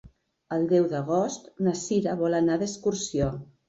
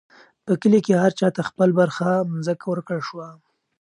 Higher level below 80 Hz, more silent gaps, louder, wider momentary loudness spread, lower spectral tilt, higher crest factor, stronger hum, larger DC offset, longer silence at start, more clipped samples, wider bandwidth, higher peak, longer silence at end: first, -52 dBFS vs -68 dBFS; neither; second, -26 LUFS vs -21 LUFS; second, 6 LU vs 15 LU; about the same, -6 dB/octave vs -7 dB/octave; about the same, 16 dB vs 16 dB; neither; neither; second, 0.05 s vs 0.45 s; neither; second, 8 kHz vs 10.5 kHz; second, -12 dBFS vs -4 dBFS; second, 0.25 s vs 0.45 s